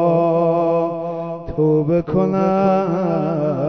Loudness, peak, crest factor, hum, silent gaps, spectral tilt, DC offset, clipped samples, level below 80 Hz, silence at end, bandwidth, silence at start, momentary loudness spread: -18 LUFS; -4 dBFS; 14 dB; none; none; -10 dB/octave; 0.2%; under 0.1%; -46 dBFS; 0 s; 6.4 kHz; 0 s; 9 LU